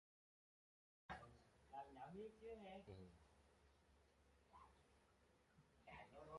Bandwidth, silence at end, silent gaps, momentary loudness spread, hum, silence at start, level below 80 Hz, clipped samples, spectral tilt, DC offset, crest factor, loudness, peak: 11 kHz; 0 s; none; 10 LU; none; 1.1 s; -78 dBFS; under 0.1%; -6 dB/octave; under 0.1%; 22 dB; -61 LUFS; -42 dBFS